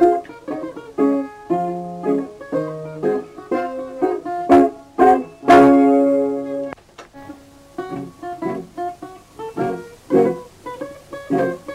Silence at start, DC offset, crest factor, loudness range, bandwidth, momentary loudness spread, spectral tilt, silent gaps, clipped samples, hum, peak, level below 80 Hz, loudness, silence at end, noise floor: 0 s; under 0.1%; 18 dB; 13 LU; 11 kHz; 19 LU; -7 dB/octave; none; under 0.1%; none; -2 dBFS; -52 dBFS; -18 LUFS; 0 s; -41 dBFS